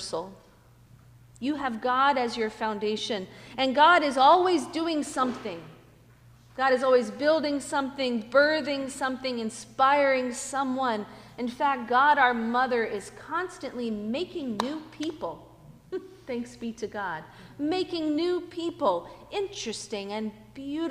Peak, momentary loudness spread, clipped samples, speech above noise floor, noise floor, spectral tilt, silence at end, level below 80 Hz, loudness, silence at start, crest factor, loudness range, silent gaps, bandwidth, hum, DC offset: -8 dBFS; 16 LU; under 0.1%; 29 dB; -55 dBFS; -3.5 dB/octave; 0 s; -62 dBFS; -27 LUFS; 0 s; 20 dB; 10 LU; none; 15.5 kHz; none; under 0.1%